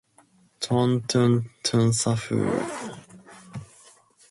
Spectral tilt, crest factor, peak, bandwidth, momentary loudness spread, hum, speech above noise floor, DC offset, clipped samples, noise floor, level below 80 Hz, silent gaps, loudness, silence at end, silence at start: -5.5 dB/octave; 16 dB; -10 dBFS; 11.5 kHz; 20 LU; none; 37 dB; under 0.1%; under 0.1%; -60 dBFS; -58 dBFS; none; -24 LUFS; 0.65 s; 0.6 s